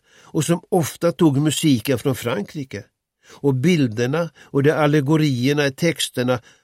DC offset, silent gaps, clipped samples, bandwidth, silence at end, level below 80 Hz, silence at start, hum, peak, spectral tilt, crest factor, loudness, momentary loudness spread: under 0.1%; none; under 0.1%; 16.5 kHz; 0.25 s; -58 dBFS; 0.35 s; none; -4 dBFS; -5.5 dB/octave; 16 dB; -20 LUFS; 8 LU